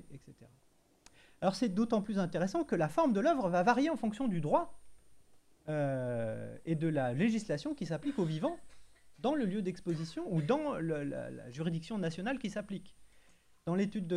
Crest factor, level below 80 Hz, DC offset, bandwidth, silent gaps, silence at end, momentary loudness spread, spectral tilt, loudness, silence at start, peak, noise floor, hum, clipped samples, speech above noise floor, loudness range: 20 dB; -66 dBFS; under 0.1%; 12 kHz; none; 0 s; 11 LU; -7 dB/octave; -34 LUFS; 0.1 s; -16 dBFS; -68 dBFS; none; under 0.1%; 35 dB; 5 LU